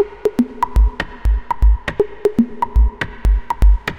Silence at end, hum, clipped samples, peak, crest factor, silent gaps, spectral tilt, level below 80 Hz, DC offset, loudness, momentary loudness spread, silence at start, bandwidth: 0 s; none; under 0.1%; -2 dBFS; 12 dB; none; -8 dB/octave; -16 dBFS; under 0.1%; -18 LUFS; 4 LU; 0 s; 5.8 kHz